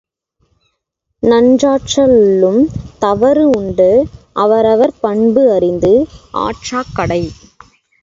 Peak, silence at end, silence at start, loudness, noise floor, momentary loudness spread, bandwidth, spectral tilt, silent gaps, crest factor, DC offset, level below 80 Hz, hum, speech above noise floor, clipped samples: 0 dBFS; 0.7 s; 1.25 s; -12 LUFS; -71 dBFS; 10 LU; 7.8 kHz; -6 dB/octave; none; 12 dB; under 0.1%; -40 dBFS; none; 60 dB; under 0.1%